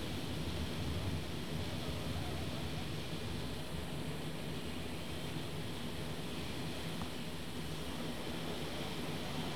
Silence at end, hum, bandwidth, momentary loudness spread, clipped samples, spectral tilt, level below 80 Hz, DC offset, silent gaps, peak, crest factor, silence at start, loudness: 0 s; none; over 20 kHz; 3 LU; under 0.1%; -5 dB/octave; -54 dBFS; 0.6%; none; -28 dBFS; 16 dB; 0 s; -42 LUFS